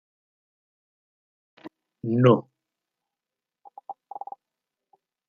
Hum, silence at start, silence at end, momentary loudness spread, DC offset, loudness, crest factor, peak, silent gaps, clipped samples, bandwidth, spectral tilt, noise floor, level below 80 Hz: none; 1.65 s; 1.35 s; 26 LU; under 0.1%; -22 LUFS; 26 dB; -4 dBFS; none; under 0.1%; 6.6 kHz; -9.5 dB/octave; -89 dBFS; -76 dBFS